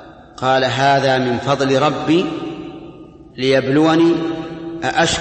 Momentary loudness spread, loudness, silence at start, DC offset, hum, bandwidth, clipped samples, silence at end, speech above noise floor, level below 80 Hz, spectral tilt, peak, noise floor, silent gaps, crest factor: 15 LU; -16 LUFS; 0 s; under 0.1%; none; 8.8 kHz; under 0.1%; 0 s; 23 dB; -48 dBFS; -5 dB/octave; -2 dBFS; -38 dBFS; none; 14 dB